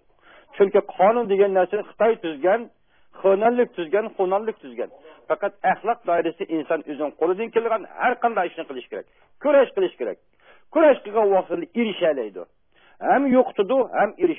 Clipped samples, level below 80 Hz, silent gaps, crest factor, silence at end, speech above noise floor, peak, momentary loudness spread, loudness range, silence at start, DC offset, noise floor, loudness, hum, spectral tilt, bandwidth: under 0.1%; -70 dBFS; none; 16 dB; 0 s; 32 dB; -6 dBFS; 14 LU; 4 LU; 0.55 s; 0.1%; -53 dBFS; -22 LUFS; none; -10 dB/octave; 3.7 kHz